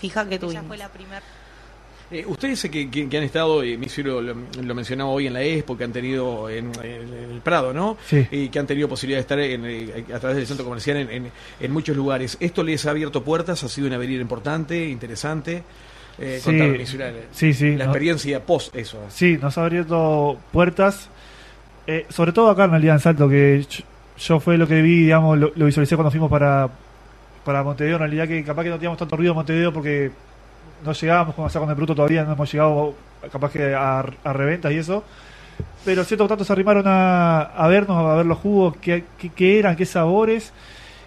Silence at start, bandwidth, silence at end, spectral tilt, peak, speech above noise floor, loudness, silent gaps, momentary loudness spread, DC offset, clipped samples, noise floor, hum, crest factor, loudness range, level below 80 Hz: 0 s; 13 kHz; 0 s; -7 dB/octave; -2 dBFS; 25 dB; -20 LUFS; none; 15 LU; under 0.1%; under 0.1%; -45 dBFS; none; 18 dB; 8 LU; -46 dBFS